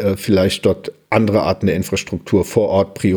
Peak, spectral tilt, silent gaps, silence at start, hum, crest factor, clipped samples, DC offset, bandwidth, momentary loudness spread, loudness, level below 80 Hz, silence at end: -2 dBFS; -6 dB/octave; none; 0 s; none; 16 dB; under 0.1%; under 0.1%; over 20 kHz; 5 LU; -17 LUFS; -44 dBFS; 0 s